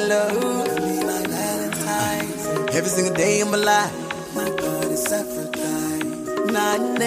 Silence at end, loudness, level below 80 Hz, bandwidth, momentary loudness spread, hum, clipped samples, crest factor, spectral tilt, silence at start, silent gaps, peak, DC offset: 0 s; -22 LUFS; -56 dBFS; 15.5 kHz; 7 LU; none; under 0.1%; 14 dB; -3.5 dB/octave; 0 s; none; -8 dBFS; under 0.1%